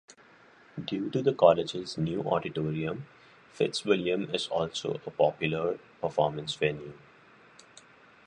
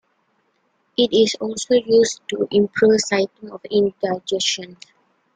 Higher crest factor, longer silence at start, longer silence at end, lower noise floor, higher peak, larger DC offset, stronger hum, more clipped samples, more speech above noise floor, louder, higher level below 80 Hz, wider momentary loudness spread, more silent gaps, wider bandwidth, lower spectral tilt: first, 24 dB vs 16 dB; second, 0.1 s vs 1 s; first, 1.3 s vs 0.6 s; second, -57 dBFS vs -66 dBFS; about the same, -6 dBFS vs -4 dBFS; neither; neither; neither; second, 28 dB vs 47 dB; second, -29 LUFS vs -19 LUFS; about the same, -64 dBFS vs -62 dBFS; about the same, 12 LU vs 10 LU; neither; first, 10.5 kHz vs 9.4 kHz; first, -5.5 dB/octave vs -3.5 dB/octave